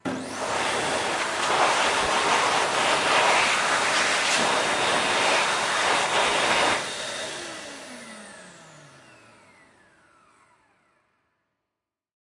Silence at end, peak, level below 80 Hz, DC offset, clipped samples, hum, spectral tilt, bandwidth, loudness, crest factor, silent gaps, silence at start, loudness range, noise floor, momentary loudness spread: 3.55 s; -8 dBFS; -60 dBFS; under 0.1%; under 0.1%; none; -1 dB/octave; 11.5 kHz; -22 LUFS; 18 dB; none; 0.05 s; 14 LU; -86 dBFS; 15 LU